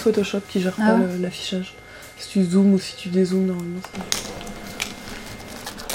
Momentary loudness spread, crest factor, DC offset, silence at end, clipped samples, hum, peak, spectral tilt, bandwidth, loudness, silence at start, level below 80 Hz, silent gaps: 17 LU; 22 dB; under 0.1%; 0 s; under 0.1%; none; 0 dBFS; -5.5 dB/octave; 16.5 kHz; -22 LUFS; 0 s; -48 dBFS; none